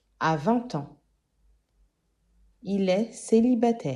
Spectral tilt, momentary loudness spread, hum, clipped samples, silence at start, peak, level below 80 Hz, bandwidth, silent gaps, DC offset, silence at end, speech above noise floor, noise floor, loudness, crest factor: -6.5 dB/octave; 14 LU; none; under 0.1%; 0.2 s; -10 dBFS; -64 dBFS; 11 kHz; none; under 0.1%; 0 s; 45 dB; -70 dBFS; -25 LUFS; 18 dB